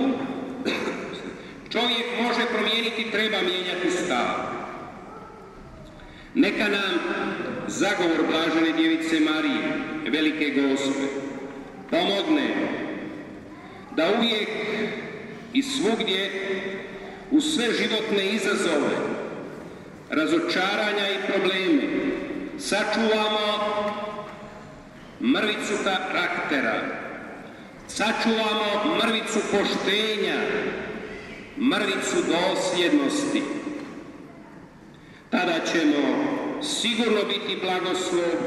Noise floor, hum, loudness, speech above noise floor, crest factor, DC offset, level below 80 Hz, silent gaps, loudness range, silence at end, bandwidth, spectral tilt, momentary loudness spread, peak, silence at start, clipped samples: -47 dBFS; none; -24 LUFS; 23 dB; 16 dB; under 0.1%; -60 dBFS; none; 3 LU; 0 s; 12.5 kHz; -3.5 dB/octave; 17 LU; -10 dBFS; 0 s; under 0.1%